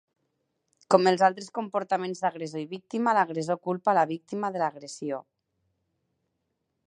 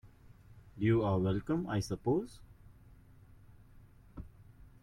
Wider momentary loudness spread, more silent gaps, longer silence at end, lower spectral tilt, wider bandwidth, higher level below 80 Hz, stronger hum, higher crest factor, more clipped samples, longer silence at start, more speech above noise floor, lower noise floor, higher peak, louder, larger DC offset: second, 13 LU vs 24 LU; neither; first, 1.65 s vs 0.15 s; second, -5.5 dB/octave vs -7.5 dB/octave; second, 11 kHz vs 13.5 kHz; second, -80 dBFS vs -56 dBFS; neither; first, 26 dB vs 18 dB; neither; first, 0.9 s vs 0.05 s; first, 53 dB vs 26 dB; first, -79 dBFS vs -58 dBFS; first, -2 dBFS vs -18 dBFS; first, -27 LUFS vs -33 LUFS; neither